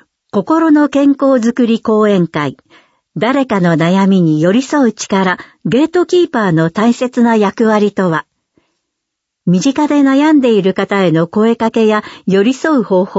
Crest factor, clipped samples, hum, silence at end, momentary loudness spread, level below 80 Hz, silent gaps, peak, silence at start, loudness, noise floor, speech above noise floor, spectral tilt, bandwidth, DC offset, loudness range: 12 dB; under 0.1%; none; 0 s; 6 LU; -56 dBFS; none; 0 dBFS; 0.35 s; -12 LUFS; -75 dBFS; 64 dB; -6.5 dB/octave; 8 kHz; under 0.1%; 2 LU